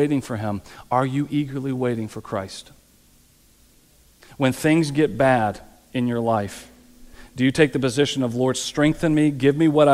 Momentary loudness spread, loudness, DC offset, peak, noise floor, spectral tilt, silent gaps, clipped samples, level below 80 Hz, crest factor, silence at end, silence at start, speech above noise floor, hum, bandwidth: 12 LU; -21 LUFS; under 0.1%; -2 dBFS; -55 dBFS; -6 dB/octave; none; under 0.1%; -50 dBFS; 20 dB; 0 s; 0 s; 35 dB; none; 15 kHz